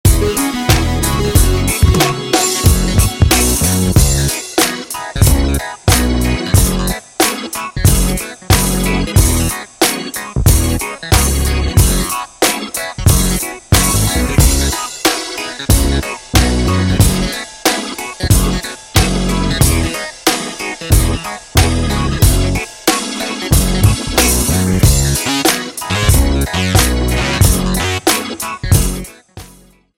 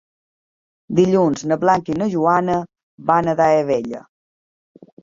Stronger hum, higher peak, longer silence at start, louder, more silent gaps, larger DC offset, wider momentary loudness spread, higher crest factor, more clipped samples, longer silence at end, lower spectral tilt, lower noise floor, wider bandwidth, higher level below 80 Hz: neither; about the same, 0 dBFS vs -2 dBFS; second, 0.05 s vs 0.9 s; first, -14 LUFS vs -18 LUFS; second, none vs 2.83-2.98 s; neither; about the same, 8 LU vs 10 LU; about the same, 14 dB vs 18 dB; neither; second, 0.5 s vs 1.05 s; second, -4 dB/octave vs -7 dB/octave; second, -44 dBFS vs under -90 dBFS; first, 17.5 kHz vs 7.6 kHz; first, -18 dBFS vs -56 dBFS